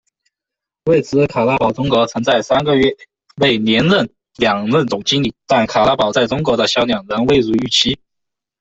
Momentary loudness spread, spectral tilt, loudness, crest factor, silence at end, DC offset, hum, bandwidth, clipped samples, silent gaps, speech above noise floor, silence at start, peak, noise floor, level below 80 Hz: 5 LU; -5 dB/octave; -15 LUFS; 16 dB; 0.65 s; under 0.1%; none; 8.2 kHz; under 0.1%; none; 70 dB; 0.85 s; 0 dBFS; -85 dBFS; -46 dBFS